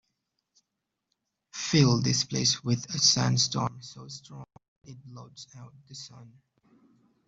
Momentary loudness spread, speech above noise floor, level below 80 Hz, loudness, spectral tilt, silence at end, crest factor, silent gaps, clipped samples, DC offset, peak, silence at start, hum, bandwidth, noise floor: 24 LU; 56 dB; -62 dBFS; -25 LUFS; -3.5 dB/octave; 1 s; 22 dB; 4.68-4.81 s; under 0.1%; under 0.1%; -8 dBFS; 1.55 s; none; 7.8 kHz; -84 dBFS